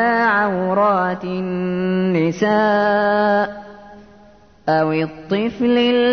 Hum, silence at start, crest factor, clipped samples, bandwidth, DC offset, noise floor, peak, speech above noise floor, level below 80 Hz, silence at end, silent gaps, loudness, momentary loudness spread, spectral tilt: none; 0 s; 12 dB; under 0.1%; 6.6 kHz; 0.2%; -48 dBFS; -6 dBFS; 31 dB; -56 dBFS; 0 s; none; -18 LUFS; 7 LU; -7 dB/octave